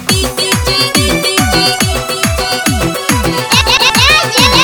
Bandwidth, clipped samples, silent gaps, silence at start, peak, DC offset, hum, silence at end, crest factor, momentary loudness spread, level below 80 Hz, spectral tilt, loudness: 18.5 kHz; 0.1%; none; 0 s; 0 dBFS; under 0.1%; none; 0 s; 10 dB; 6 LU; -24 dBFS; -3 dB/octave; -10 LUFS